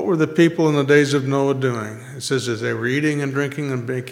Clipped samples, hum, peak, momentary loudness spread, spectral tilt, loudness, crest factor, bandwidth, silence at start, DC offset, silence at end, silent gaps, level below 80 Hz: under 0.1%; none; -2 dBFS; 10 LU; -6 dB/octave; -19 LUFS; 18 dB; 15.5 kHz; 0 s; under 0.1%; 0 s; none; -66 dBFS